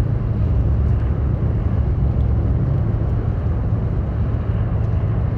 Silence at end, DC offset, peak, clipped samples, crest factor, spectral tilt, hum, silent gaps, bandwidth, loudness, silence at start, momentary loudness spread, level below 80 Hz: 0 s; under 0.1%; -8 dBFS; under 0.1%; 10 dB; -11 dB/octave; none; none; 3.4 kHz; -20 LUFS; 0 s; 3 LU; -22 dBFS